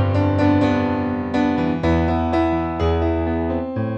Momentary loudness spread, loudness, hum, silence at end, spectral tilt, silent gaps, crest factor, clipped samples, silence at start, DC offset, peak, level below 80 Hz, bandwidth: 5 LU; -20 LUFS; none; 0 s; -8.5 dB/octave; none; 14 dB; under 0.1%; 0 s; under 0.1%; -6 dBFS; -32 dBFS; 7.8 kHz